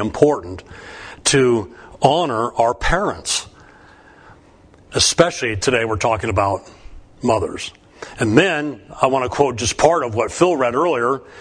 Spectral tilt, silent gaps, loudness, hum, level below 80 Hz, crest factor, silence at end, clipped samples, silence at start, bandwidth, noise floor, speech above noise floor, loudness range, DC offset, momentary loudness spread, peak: -4 dB/octave; none; -18 LUFS; none; -38 dBFS; 18 dB; 0 s; under 0.1%; 0 s; 11 kHz; -48 dBFS; 30 dB; 3 LU; under 0.1%; 14 LU; 0 dBFS